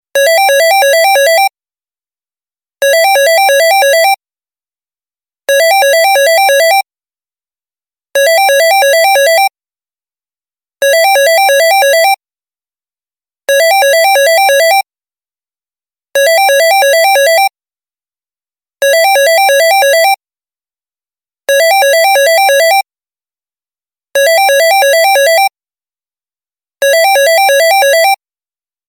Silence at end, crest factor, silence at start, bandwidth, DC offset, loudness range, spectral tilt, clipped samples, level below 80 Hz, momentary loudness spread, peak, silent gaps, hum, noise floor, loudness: 0.75 s; 10 dB; 0.15 s; 17 kHz; under 0.1%; 1 LU; 4.5 dB/octave; under 0.1%; -86 dBFS; 7 LU; 0 dBFS; none; none; under -90 dBFS; -7 LUFS